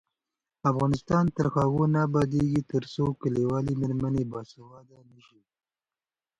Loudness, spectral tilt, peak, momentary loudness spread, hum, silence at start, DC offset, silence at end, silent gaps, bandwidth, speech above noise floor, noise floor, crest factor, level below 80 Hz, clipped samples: -27 LUFS; -8.5 dB/octave; -10 dBFS; 6 LU; none; 0.65 s; under 0.1%; 1.6 s; none; 9.8 kHz; over 63 dB; under -90 dBFS; 16 dB; -52 dBFS; under 0.1%